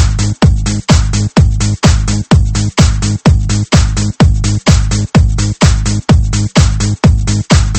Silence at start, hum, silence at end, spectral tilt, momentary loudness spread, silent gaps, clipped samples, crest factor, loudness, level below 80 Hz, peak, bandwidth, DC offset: 0 s; none; 0 s; -5.5 dB/octave; 2 LU; none; 0.5%; 10 dB; -11 LUFS; -14 dBFS; 0 dBFS; 8.8 kHz; under 0.1%